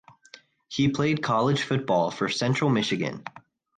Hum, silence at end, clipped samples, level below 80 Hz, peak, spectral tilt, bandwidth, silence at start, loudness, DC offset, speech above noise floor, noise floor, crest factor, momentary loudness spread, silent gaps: none; 0.4 s; under 0.1%; -60 dBFS; -10 dBFS; -5.5 dB/octave; 9.4 kHz; 0.7 s; -25 LUFS; under 0.1%; 29 dB; -53 dBFS; 16 dB; 9 LU; none